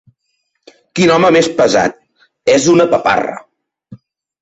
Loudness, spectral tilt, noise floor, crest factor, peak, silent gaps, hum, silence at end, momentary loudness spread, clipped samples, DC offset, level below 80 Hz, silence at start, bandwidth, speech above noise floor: -12 LUFS; -4.5 dB/octave; -68 dBFS; 14 dB; -2 dBFS; none; none; 0.45 s; 12 LU; under 0.1%; under 0.1%; -52 dBFS; 0.95 s; 8.4 kHz; 57 dB